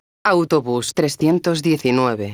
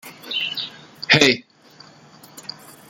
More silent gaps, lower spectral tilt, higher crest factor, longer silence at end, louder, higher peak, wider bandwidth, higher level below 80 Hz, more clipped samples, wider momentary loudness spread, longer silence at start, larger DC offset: neither; first, -5.5 dB/octave vs -3 dB/octave; second, 16 dB vs 24 dB; second, 0 s vs 0.5 s; about the same, -18 LUFS vs -18 LUFS; about the same, -2 dBFS vs 0 dBFS; first, over 20 kHz vs 17 kHz; about the same, -58 dBFS vs -60 dBFS; neither; second, 3 LU vs 22 LU; first, 0.25 s vs 0.05 s; neither